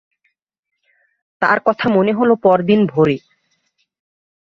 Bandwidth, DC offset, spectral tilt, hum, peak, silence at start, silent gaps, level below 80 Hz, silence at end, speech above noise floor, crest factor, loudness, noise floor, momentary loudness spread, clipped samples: 6.4 kHz; under 0.1%; -8.5 dB/octave; none; -2 dBFS; 1.4 s; none; -58 dBFS; 1.3 s; 54 dB; 16 dB; -15 LUFS; -68 dBFS; 4 LU; under 0.1%